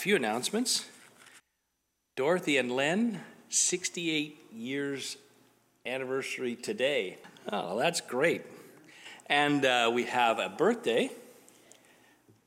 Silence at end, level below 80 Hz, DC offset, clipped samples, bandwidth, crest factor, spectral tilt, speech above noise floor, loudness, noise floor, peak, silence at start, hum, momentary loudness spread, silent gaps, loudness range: 1.15 s; -84 dBFS; under 0.1%; under 0.1%; 16.5 kHz; 20 dB; -2.5 dB/octave; 50 dB; -30 LUFS; -80 dBFS; -12 dBFS; 0 s; none; 17 LU; none; 6 LU